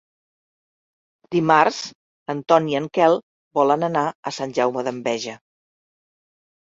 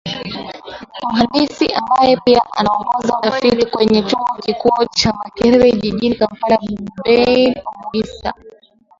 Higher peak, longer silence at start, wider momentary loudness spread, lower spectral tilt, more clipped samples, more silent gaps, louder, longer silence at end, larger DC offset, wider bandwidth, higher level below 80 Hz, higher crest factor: about the same, -2 dBFS vs 0 dBFS; first, 1.3 s vs 0.05 s; about the same, 13 LU vs 13 LU; about the same, -5 dB/octave vs -5 dB/octave; neither; first, 1.95-2.26 s, 3.23-3.51 s, 4.15-4.23 s vs none; second, -21 LUFS vs -15 LUFS; first, 1.4 s vs 0.5 s; neither; about the same, 7.8 kHz vs 7.6 kHz; second, -68 dBFS vs -44 dBFS; first, 22 dB vs 16 dB